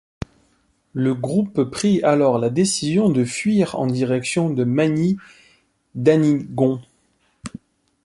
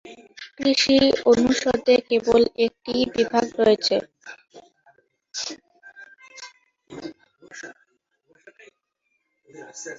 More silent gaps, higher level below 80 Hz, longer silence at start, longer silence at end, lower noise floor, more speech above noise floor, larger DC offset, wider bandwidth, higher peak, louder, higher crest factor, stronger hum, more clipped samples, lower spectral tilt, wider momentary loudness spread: neither; about the same, -52 dBFS vs -56 dBFS; first, 0.95 s vs 0.05 s; first, 0.55 s vs 0 s; second, -63 dBFS vs -74 dBFS; second, 45 dB vs 53 dB; neither; first, 11.5 kHz vs 7.8 kHz; first, -2 dBFS vs -6 dBFS; about the same, -19 LUFS vs -20 LUFS; about the same, 18 dB vs 18 dB; neither; neither; first, -6 dB/octave vs -3.5 dB/octave; second, 19 LU vs 25 LU